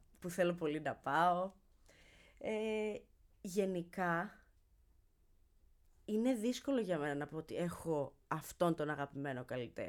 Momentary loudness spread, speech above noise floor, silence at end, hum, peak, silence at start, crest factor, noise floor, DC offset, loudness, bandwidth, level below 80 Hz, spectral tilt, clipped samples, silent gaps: 9 LU; 32 dB; 0 s; none; -20 dBFS; 0.2 s; 20 dB; -70 dBFS; under 0.1%; -39 LUFS; 19 kHz; -68 dBFS; -6 dB/octave; under 0.1%; none